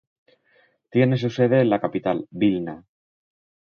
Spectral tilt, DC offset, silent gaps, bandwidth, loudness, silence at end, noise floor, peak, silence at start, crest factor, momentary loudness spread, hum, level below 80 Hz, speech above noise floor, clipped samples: -8.5 dB/octave; under 0.1%; none; 6.8 kHz; -22 LUFS; 0.9 s; -62 dBFS; -4 dBFS; 0.95 s; 18 dB; 10 LU; none; -62 dBFS; 41 dB; under 0.1%